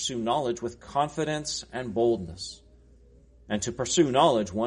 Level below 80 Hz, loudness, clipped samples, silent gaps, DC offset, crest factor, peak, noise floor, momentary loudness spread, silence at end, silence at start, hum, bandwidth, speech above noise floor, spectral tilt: -54 dBFS; -27 LUFS; under 0.1%; none; under 0.1%; 20 dB; -8 dBFS; -55 dBFS; 12 LU; 0 s; 0 s; none; 10.5 kHz; 28 dB; -4 dB/octave